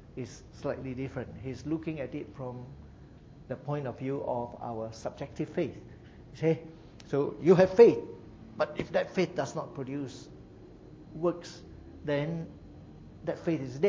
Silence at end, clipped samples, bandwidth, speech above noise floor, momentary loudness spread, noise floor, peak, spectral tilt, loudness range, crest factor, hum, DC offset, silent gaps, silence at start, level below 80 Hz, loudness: 0 s; under 0.1%; 7.6 kHz; 21 dB; 24 LU; -51 dBFS; -6 dBFS; -7.5 dB/octave; 12 LU; 24 dB; none; under 0.1%; none; 0 s; -56 dBFS; -31 LUFS